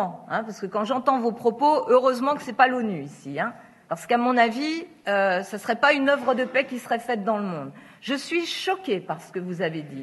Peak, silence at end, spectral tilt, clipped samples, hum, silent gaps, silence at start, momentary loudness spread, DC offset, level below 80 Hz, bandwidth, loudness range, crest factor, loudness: -2 dBFS; 0 s; -5 dB/octave; under 0.1%; none; none; 0 s; 12 LU; under 0.1%; -78 dBFS; 12 kHz; 4 LU; 22 dB; -24 LUFS